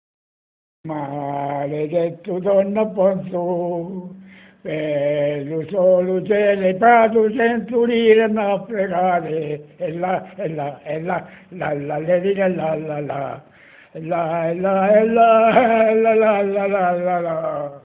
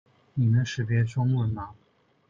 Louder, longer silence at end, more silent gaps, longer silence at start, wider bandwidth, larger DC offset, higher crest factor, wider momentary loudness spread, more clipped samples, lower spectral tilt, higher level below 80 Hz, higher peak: first, -19 LUFS vs -26 LUFS; second, 0.05 s vs 0.55 s; neither; first, 0.85 s vs 0.35 s; second, 4 kHz vs 7.4 kHz; neither; about the same, 18 dB vs 14 dB; about the same, 14 LU vs 12 LU; neither; first, -10.5 dB/octave vs -7 dB/octave; about the same, -60 dBFS vs -56 dBFS; first, 0 dBFS vs -14 dBFS